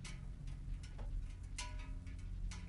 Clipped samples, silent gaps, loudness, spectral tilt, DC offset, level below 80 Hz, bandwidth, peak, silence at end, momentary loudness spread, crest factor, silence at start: under 0.1%; none; -50 LUFS; -4 dB/octave; under 0.1%; -46 dBFS; 11 kHz; -32 dBFS; 0 s; 3 LU; 14 dB; 0 s